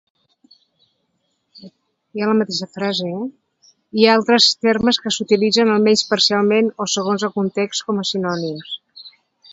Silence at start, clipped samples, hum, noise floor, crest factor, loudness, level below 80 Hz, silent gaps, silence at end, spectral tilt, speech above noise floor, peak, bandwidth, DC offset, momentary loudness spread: 1.55 s; under 0.1%; none; -69 dBFS; 20 dB; -17 LUFS; -60 dBFS; none; 0.45 s; -3.5 dB/octave; 52 dB; 0 dBFS; 8 kHz; under 0.1%; 13 LU